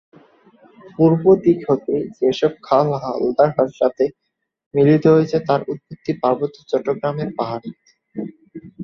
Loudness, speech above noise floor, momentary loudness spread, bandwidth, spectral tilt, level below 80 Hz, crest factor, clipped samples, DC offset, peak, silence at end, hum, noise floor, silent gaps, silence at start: -18 LUFS; 34 dB; 16 LU; 7 kHz; -8.5 dB/octave; -58 dBFS; 18 dB; under 0.1%; under 0.1%; -2 dBFS; 0 s; none; -51 dBFS; 4.66-4.71 s; 0.85 s